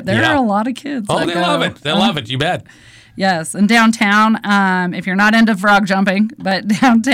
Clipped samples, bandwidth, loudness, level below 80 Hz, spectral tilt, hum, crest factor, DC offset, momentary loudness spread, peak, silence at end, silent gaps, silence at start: under 0.1%; 15.5 kHz; -14 LUFS; -50 dBFS; -5 dB/octave; none; 10 dB; under 0.1%; 8 LU; -4 dBFS; 0 s; none; 0 s